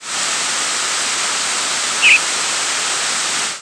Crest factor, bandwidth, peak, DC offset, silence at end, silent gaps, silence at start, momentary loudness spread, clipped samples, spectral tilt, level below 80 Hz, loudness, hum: 18 dB; 11 kHz; 0 dBFS; under 0.1%; 0 s; none; 0 s; 7 LU; under 0.1%; 2 dB/octave; -64 dBFS; -15 LUFS; none